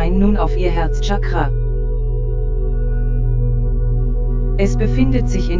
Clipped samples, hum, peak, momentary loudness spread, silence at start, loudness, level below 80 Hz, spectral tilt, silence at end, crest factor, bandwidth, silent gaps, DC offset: under 0.1%; none; -2 dBFS; 6 LU; 0 s; -19 LUFS; -16 dBFS; -7.5 dB/octave; 0 s; 14 dB; 7.6 kHz; none; under 0.1%